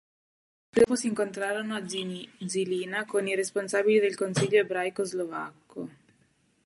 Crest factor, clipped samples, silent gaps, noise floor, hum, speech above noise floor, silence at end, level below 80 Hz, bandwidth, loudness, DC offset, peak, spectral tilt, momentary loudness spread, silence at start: 20 dB; under 0.1%; none; -67 dBFS; none; 40 dB; 0.75 s; -68 dBFS; 11.5 kHz; -28 LUFS; under 0.1%; -10 dBFS; -4.5 dB/octave; 14 LU; 0.75 s